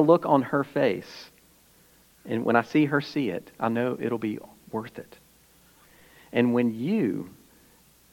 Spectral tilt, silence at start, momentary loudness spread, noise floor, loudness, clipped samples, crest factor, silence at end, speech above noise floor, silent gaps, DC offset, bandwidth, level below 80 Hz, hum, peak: -7.5 dB/octave; 0 s; 15 LU; -58 dBFS; -26 LUFS; under 0.1%; 22 dB; 0.8 s; 33 dB; none; under 0.1%; 17.5 kHz; -68 dBFS; none; -6 dBFS